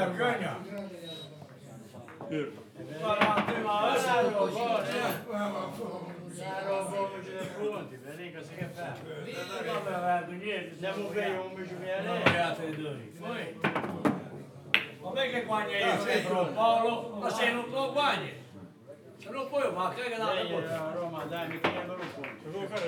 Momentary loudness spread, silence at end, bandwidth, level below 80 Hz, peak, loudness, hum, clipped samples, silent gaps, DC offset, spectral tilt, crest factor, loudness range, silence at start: 16 LU; 0 s; over 20 kHz; -84 dBFS; -4 dBFS; -32 LUFS; none; under 0.1%; none; under 0.1%; -5 dB/octave; 30 dB; 7 LU; 0 s